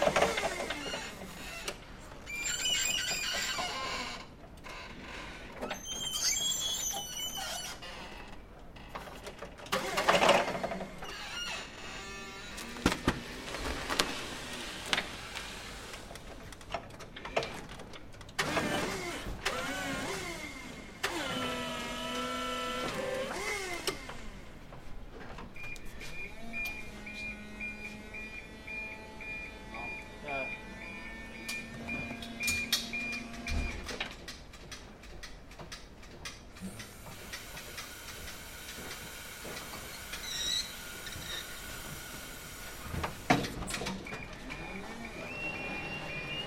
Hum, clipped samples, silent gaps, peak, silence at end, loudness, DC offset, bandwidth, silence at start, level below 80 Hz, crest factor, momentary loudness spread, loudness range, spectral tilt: none; under 0.1%; none; 0 dBFS; 0 s; -36 LUFS; under 0.1%; 16.5 kHz; 0 s; -52 dBFS; 38 dB; 16 LU; 10 LU; -2.5 dB/octave